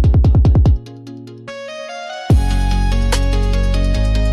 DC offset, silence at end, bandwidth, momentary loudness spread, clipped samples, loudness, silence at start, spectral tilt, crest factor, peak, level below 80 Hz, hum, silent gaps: under 0.1%; 0 s; 12 kHz; 20 LU; under 0.1%; -16 LUFS; 0 s; -6.5 dB/octave; 10 dB; -4 dBFS; -16 dBFS; none; none